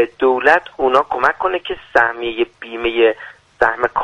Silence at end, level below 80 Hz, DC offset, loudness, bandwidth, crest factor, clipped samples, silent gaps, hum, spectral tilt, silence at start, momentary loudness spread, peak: 0 s; -48 dBFS; under 0.1%; -16 LUFS; 9.8 kHz; 16 dB; under 0.1%; none; none; -4.5 dB/octave; 0 s; 9 LU; 0 dBFS